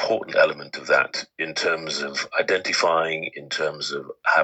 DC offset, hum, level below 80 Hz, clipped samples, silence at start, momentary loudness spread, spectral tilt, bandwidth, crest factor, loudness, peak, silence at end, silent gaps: under 0.1%; none; -72 dBFS; under 0.1%; 0 s; 9 LU; -2 dB/octave; 8.8 kHz; 18 dB; -23 LUFS; -4 dBFS; 0 s; none